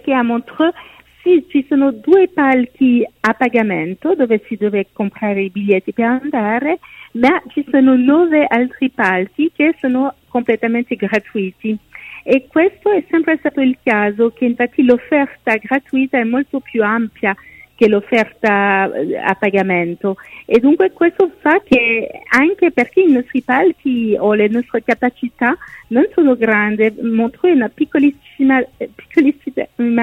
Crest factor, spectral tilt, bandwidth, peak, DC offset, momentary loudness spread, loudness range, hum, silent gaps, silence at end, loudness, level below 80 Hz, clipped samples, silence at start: 14 dB; -7 dB/octave; 7.6 kHz; 0 dBFS; under 0.1%; 7 LU; 3 LU; none; none; 0 s; -15 LUFS; -54 dBFS; under 0.1%; 0.05 s